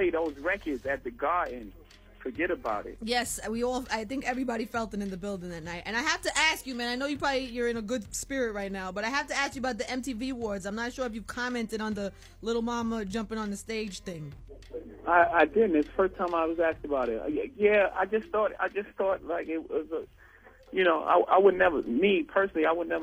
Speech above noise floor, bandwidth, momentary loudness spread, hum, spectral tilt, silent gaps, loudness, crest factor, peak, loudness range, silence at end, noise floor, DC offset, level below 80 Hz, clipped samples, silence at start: 26 dB; 16 kHz; 13 LU; none; -4 dB/octave; none; -29 LUFS; 20 dB; -8 dBFS; 7 LU; 0 s; -55 dBFS; under 0.1%; -52 dBFS; under 0.1%; 0 s